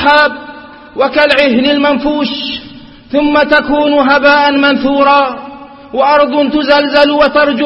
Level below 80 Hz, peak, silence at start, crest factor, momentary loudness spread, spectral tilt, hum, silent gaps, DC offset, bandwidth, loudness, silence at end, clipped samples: -40 dBFS; 0 dBFS; 0 s; 10 dB; 12 LU; -5.5 dB/octave; none; none; under 0.1%; 6.4 kHz; -9 LUFS; 0 s; 0.2%